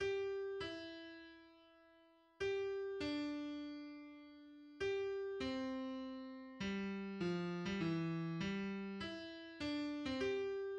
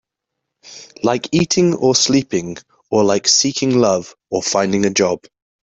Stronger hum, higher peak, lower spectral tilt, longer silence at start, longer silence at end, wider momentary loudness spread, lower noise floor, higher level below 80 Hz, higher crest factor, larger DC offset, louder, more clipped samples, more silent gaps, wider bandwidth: neither; second, -30 dBFS vs -2 dBFS; first, -6.5 dB/octave vs -3.5 dB/octave; second, 0 s vs 0.65 s; second, 0 s vs 0.6 s; first, 14 LU vs 11 LU; second, -69 dBFS vs -79 dBFS; second, -70 dBFS vs -54 dBFS; about the same, 14 dB vs 16 dB; neither; second, -43 LUFS vs -16 LUFS; neither; neither; about the same, 9 kHz vs 8.4 kHz